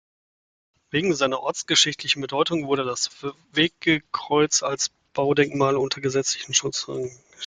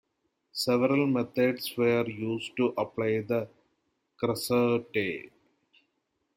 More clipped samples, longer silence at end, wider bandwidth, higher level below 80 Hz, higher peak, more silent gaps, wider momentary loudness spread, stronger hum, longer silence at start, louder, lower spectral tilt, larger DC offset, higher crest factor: neither; second, 0 s vs 1.1 s; second, 10 kHz vs 16.5 kHz; first, -62 dBFS vs -70 dBFS; first, -2 dBFS vs -12 dBFS; neither; about the same, 8 LU vs 8 LU; neither; first, 0.95 s vs 0.55 s; first, -23 LUFS vs -28 LUFS; second, -2.5 dB/octave vs -5.5 dB/octave; neither; about the same, 22 dB vs 18 dB